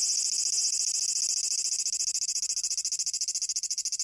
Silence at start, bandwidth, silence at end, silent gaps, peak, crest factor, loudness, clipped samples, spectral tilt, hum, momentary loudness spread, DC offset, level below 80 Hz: 0 s; 11.5 kHz; 0 s; none; -14 dBFS; 14 dB; -26 LUFS; under 0.1%; 5 dB/octave; none; 4 LU; under 0.1%; -76 dBFS